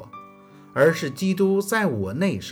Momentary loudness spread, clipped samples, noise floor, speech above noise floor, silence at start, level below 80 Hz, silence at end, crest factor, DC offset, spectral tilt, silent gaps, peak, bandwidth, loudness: 7 LU; under 0.1%; -48 dBFS; 26 dB; 0 s; -68 dBFS; 0 s; 18 dB; under 0.1%; -6 dB/octave; none; -6 dBFS; 19.5 kHz; -22 LUFS